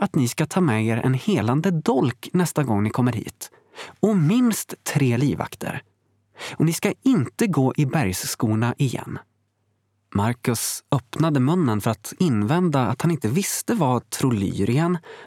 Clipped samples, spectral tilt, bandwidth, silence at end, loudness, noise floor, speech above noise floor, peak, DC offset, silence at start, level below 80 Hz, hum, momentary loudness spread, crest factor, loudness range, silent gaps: under 0.1%; -6 dB/octave; 17.5 kHz; 0 s; -22 LUFS; -70 dBFS; 48 dB; -4 dBFS; under 0.1%; 0 s; -60 dBFS; none; 9 LU; 18 dB; 3 LU; none